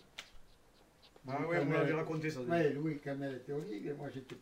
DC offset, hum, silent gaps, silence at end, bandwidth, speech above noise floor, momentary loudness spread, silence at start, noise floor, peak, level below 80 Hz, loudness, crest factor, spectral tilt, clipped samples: under 0.1%; none; none; 0 s; 16 kHz; 28 dB; 13 LU; 0.2 s; -65 dBFS; -20 dBFS; -68 dBFS; -37 LUFS; 18 dB; -7 dB/octave; under 0.1%